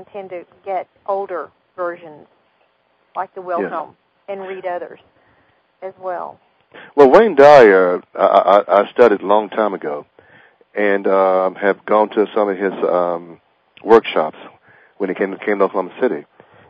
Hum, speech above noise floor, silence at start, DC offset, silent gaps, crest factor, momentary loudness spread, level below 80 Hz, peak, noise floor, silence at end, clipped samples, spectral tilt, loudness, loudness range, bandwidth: none; 45 dB; 0 s; under 0.1%; none; 16 dB; 21 LU; -60 dBFS; 0 dBFS; -61 dBFS; 0.5 s; 0.4%; -6.5 dB/octave; -15 LUFS; 16 LU; 8 kHz